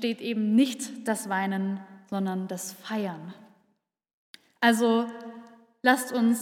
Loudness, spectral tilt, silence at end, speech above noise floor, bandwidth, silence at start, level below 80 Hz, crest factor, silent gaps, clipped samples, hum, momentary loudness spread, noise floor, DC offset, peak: -27 LUFS; -4.5 dB/octave; 0 s; 49 dB; 17 kHz; 0 s; -86 dBFS; 22 dB; 4.13-4.34 s; under 0.1%; none; 13 LU; -75 dBFS; under 0.1%; -6 dBFS